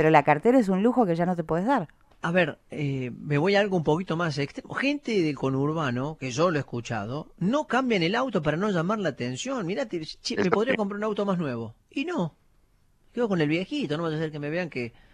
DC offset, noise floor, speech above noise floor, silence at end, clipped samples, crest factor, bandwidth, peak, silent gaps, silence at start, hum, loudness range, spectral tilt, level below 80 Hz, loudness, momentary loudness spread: under 0.1%; -62 dBFS; 37 dB; 0.25 s; under 0.1%; 22 dB; 11 kHz; -4 dBFS; none; 0 s; none; 4 LU; -6 dB/octave; -58 dBFS; -26 LUFS; 10 LU